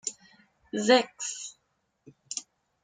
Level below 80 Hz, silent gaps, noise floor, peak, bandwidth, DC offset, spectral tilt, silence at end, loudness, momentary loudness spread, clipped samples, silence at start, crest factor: -78 dBFS; none; -76 dBFS; -8 dBFS; 9.6 kHz; under 0.1%; -2 dB/octave; 0.45 s; -28 LUFS; 16 LU; under 0.1%; 0.05 s; 24 dB